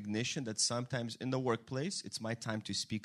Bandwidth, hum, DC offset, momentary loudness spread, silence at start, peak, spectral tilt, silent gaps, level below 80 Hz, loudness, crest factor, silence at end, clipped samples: 13.5 kHz; none; under 0.1%; 6 LU; 0 s; -18 dBFS; -3.5 dB/octave; none; -74 dBFS; -37 LUFS; 18 dB; 0 s; under 0.1%